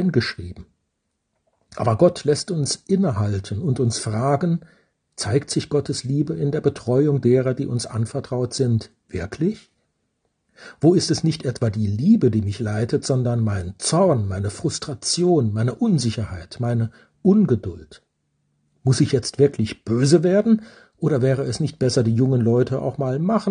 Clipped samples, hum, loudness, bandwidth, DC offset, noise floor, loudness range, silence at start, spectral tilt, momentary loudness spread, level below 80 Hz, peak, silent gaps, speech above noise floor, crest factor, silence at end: under 0.1%; none; -21 LUFS; 10 kHz; under 0.1%; -75 dBFS; 3 LU; 0 s; -6.5 dB/octave; 9 LU; -54 dBFS; -2 dBFS; none; 55 dB; 18 dB; 0 s